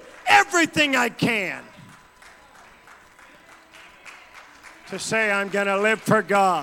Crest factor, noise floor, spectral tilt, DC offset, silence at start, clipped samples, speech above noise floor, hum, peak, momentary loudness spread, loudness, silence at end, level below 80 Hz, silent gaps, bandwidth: 20 dB; -50 dBFS; -3.5 dB/octave; under 0.1%; 0.05 s; under 0.1%; 28 dB; none; -4 dBFS; 17 LU; -20 LUFS; 0 s; -64 dBFS; none; 17 kHz